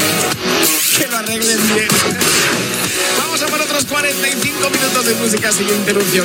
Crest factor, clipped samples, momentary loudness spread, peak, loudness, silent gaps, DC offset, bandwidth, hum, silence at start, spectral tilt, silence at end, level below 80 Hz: 14 dB; under 0.1%; 3 LU; 0 dBFS; -13 LUFS; none; under 0.1%; 19 kHz; none; 0 s; -2 dB/octave; 0 s; -50 dBFS